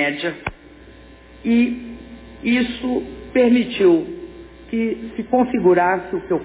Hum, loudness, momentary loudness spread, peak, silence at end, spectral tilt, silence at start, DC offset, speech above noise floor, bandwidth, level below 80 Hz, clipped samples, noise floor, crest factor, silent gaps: none; -19 LUFS; 16 LU; -4 dBFS; 0 s; -10 dB/octave; 0 s; under 0.1%; 25 dB; 4 kHz; -46 dBFS; under 0.1%; -43 dBFS; 14 dB; none